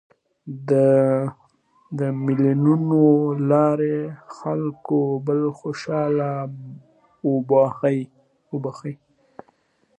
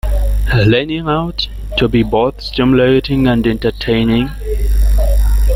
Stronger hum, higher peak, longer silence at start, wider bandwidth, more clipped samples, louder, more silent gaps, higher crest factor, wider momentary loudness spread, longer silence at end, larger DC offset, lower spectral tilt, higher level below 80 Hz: neither; about the same, -4 dBFS vs -2 dBFS; first, 0.45 s vs 0.05 s; second, 9.2 kHz vs 16 kHz; neither; second, -21 LUFS vs -14 LUFS; neither; first, 18 dB vs 12 dB; first, 17 LU vs 6 LU; first, 1.05 s vs 0 s; neither; first, -9.5 dB/octave vs -7 dB/octave; second, -68 dBFS vs -16 dBFS